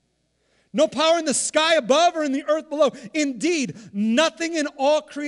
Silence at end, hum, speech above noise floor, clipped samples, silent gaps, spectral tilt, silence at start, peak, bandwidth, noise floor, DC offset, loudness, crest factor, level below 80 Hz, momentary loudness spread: 0 s; none; 48 dB; under 0.1%; none; -2.5 dB/octave; 0.75 s; -6 dBFS; 12 kHz; -69 dBFS; under 0.1%; -21 LUFS; 16 dB; -70 dBFS; 7 LU